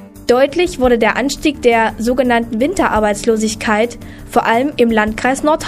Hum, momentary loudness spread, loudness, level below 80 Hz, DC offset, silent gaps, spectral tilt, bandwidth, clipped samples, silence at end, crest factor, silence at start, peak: none; 4 LU; -14 LUFS; -36 dBFS; under 0.1%; none; -4 dB/octave; 15.5 kHz; under 0.1%; 0 s; 14 dB; 0 s; 0 dBFS